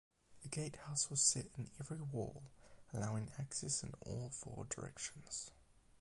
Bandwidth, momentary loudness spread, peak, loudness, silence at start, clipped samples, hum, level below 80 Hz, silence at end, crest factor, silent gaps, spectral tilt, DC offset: 11.5 kHz; 16 LU; -18 dBFS; -42 LUFS; 0.3 s; under 0.1%; none; -66 dBFS; 0.05 s; 26 dB; none; -3 dB/octave; under 0.1%